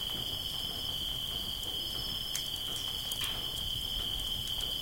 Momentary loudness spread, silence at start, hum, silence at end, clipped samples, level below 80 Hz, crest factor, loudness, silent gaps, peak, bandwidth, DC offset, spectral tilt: 1 LU; 0 s; none; 0 s; under 0.1%; -48 dBFS; 20 dB; -33 LUFS; none; -16 dBFS; 17 kHz; under 0.1%; -1.5 dB/octave